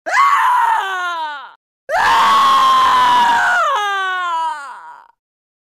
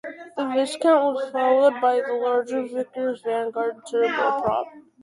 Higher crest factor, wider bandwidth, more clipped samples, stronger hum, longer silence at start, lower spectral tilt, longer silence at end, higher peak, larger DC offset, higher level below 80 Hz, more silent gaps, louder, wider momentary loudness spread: about the same, 14 dB vs 16 dB; first, 16 kHz vs 11.5 kHz; neither; neither; about the same, 0.05 s vs 0.05 s; second, -0.5 dB/octave vs -4.5 dB/octave; first, 0.65 s vs 0.25 s; first, -2 dBFS vs -8 dBFS; neither; first, -54 dBFS vs -64 dBFS; first, 1.56-1.87 s vs none; first, -13 LUFS vs -23 LUFS; first, 13 LU vs 10 LU